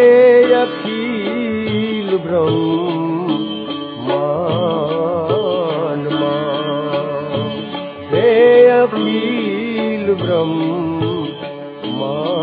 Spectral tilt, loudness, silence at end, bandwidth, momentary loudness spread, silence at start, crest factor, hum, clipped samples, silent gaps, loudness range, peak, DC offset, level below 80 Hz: -10 dB/octave; -16 LUFS; 0 s; 4.9 kHz; 13 LU; 0 s; 14 dB; none; under 0.1%; none; 5 LU; 0 dBFS; under 0.1%; -58 dBFS